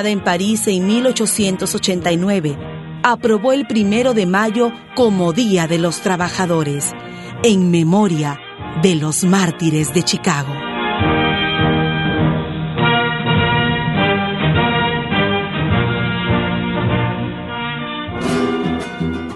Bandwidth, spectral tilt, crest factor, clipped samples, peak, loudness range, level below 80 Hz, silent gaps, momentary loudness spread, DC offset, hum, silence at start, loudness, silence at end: 12 kHz; -5 dB/octave; 16 dB; under 0.1%; 0 dBFS; 2 LU; -40 dBFS; none; 8 LU; under 0.1%; none; 0 s; -16 LUFS; 0 s